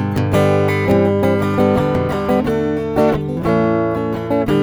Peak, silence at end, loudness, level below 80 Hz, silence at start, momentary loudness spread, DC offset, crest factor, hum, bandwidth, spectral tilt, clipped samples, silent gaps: -2 dBFS; 0 s; -16 LUFS; -38 dBFS; 0 s; 4 LU; under 0.1%; 14 dB; none; over 20 kHz; -8 dB/octave; under 0.1%; none